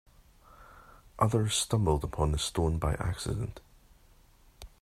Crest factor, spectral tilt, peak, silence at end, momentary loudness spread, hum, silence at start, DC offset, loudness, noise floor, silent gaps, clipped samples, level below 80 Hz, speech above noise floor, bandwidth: 20 dB; -5 dB/octave; -12 dBFS; 0.15 s; 8 LU; none; 0.6 s; under 0.1%; -30 LUFS; -60 dBFS; none; under 0.1%; -42 dBFS; 31 dB; 15.5 kHz